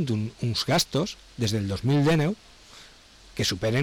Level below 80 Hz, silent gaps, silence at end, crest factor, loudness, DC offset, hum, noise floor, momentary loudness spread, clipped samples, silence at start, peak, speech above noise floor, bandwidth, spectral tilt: -50 dBFS; none; 0 s; 10 dB; -25 LUFS; under 0.1%; none; -51 dBFS; 8 LU; under 0.1%; 0 s; -16 dBFS; 26 dB; 19 kHz; -5 dB/octave